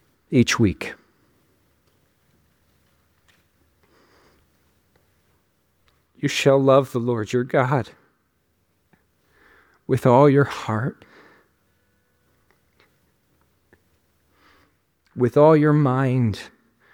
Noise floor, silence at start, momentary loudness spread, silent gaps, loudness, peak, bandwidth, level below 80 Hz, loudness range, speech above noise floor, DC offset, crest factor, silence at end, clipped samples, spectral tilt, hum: -68 dBFS; 0.3 s; 18 LU; none; -19 LUFS; -2 dBFS; 16.5 kHz; -58 dBFS; 10 LU; 50 dB; under 0.1%; 22 dB; 0.45 s; under 0.1%; -6.5 dB/octave; none